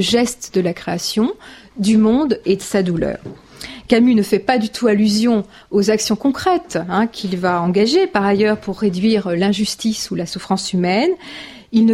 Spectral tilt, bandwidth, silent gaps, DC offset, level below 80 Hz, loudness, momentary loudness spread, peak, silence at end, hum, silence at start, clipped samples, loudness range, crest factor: -5 dB/octave; 15 kHz; none; under 0.1%; -48 dBFS; -17 LUFS; 9 LU; 0 dBFS; 0 s; none; 0 s; under 0.1%; 2 LU; 16 dB